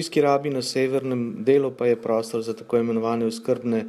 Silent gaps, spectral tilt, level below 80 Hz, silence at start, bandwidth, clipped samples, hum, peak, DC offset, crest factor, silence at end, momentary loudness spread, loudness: none; -5.5 dB/octave; -70 dBFS; 0 s; 14.5 kHz; under 0.1%; none; -8 dBFS; under 0.1%; 16 dB; 0 s; 5 LU; -23 LUFS